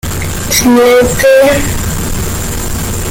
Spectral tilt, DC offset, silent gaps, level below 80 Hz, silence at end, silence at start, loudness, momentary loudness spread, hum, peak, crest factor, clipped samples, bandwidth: -4 dB/octave; under 0.1%; none; -22 dBFS; 0 s; 0.05 s; -10 LUFS; 10 LU; none; 0 dBFS; 10 dB; under 0.1%; 17 kHz